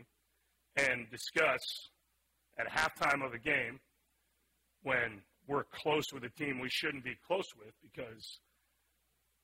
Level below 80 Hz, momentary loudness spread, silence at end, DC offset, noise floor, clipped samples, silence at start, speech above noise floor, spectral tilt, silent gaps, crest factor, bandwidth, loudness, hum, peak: -70 dBFS; 17 LU; 1.05 s; under 0.1%; -78 dBFS; under 0.1%; 0 s; 42 dB; -3.5 dB/octave; none; 22 dB; 16 kHz; -35 LUFS; none; -16 dBFS